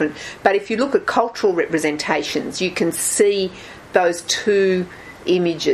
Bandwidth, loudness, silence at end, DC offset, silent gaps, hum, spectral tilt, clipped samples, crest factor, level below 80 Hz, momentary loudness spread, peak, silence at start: 14 kHz; -19 LUFS; 0 s; under 0.1%; none; none; -3.5 dB/octave; under 0.1%; 18 dB; -54 dBFS; 7 LU; 0 dBFS; 0 s